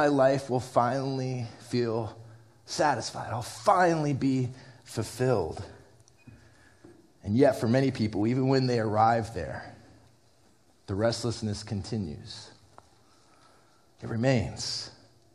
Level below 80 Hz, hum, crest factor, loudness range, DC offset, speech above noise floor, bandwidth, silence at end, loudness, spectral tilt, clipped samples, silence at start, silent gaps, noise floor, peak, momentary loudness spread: -58 dBFS; none; 20 dB; 8 LU; under 0.1%; 36 dB; 14 kHz; 0.45 s; -28 LUFS; -6 dB/octave; under 0.1%; 0 s; none; -64 dBFS; -8 dBFS; 17 LU